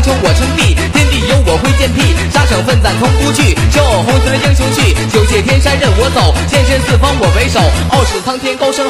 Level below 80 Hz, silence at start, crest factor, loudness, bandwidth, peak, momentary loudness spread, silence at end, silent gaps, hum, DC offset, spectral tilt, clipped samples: -14 dBFS; 0 s; 10 dB; -10 LUFS; 15.5 kHz; 0 dBFS; 1 LU; 0 s; none; none; under 0.1%; -5 dB/octave; under 0.1%